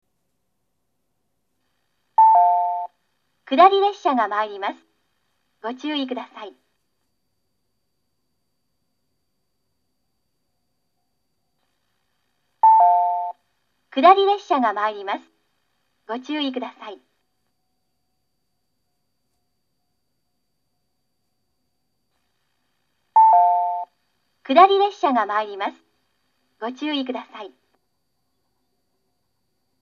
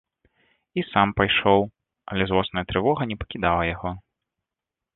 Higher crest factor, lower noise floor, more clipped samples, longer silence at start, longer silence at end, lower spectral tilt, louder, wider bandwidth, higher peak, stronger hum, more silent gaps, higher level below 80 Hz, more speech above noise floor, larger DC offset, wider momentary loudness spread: about the same, 24 dB vs 22 dB; second, -76 dBFS vs -87 dBFS; neither; first, 2.2 s vs 0.75 s; first, 2.35 s vs 0.95 s; second, -3.5 dB/octave vs -9.5 dB/octave; first, -19 LUFS vs -23 LUFS; first, 7 kHz vs 4.2 kHz; about the same, 0 dBFS vs -2 dBFS; neither; neither; second, -84 dBFS vs -44 dBFS; second, 56 dB vs 65 dB; neither; first, 19 LU vs 13 LU